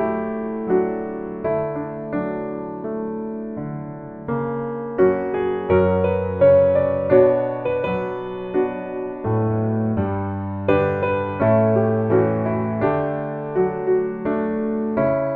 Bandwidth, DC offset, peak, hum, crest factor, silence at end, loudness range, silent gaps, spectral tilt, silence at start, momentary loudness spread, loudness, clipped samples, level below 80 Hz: 4.3 kHz; under 0.1%; -2 dBFS; none; 18 dB; 0 s; 8 LU; none; -11.5 dB/octave; 0 s; 12 LU; -21 LUFS; under 0.1%; -50 dBFS